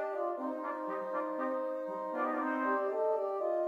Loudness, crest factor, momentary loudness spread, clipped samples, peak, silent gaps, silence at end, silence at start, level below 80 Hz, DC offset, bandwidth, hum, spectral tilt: -35 LUFS; 14 dB; 5 LU; under 0.1%; -20 dBFS; none; 0 s; 0 s; -90 dBFS; under 0.1%; 7.2 kHz; none; -6.5 dB/octave